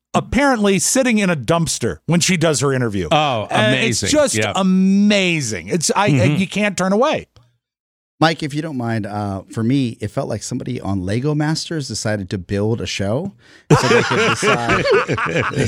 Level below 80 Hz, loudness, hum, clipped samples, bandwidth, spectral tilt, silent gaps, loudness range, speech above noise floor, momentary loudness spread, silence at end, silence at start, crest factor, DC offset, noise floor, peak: -44 dBFS; -17 LUFS; none; under 0.1%; 15.5 kHz; -4.5 dB/octave; 7.80-8.18 s; 6 LU; 37 dB; 9 LU; 0 s; 0.15 s; 16 dB; under 0.1%; -54 dBFS; 0 dBFS